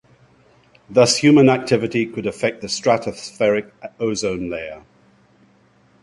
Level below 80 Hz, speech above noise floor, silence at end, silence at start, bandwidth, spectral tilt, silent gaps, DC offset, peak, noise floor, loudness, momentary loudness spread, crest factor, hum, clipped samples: -54 dBFS; 37 dB; 1.25 s; 0.9 s; 11.5 kHz; -4.5 dB/octave; none; under 0.1%; -2 dBFS; -55 dBFS; -18 LUFS; 15 LU; 18 dB; none; under 0.1%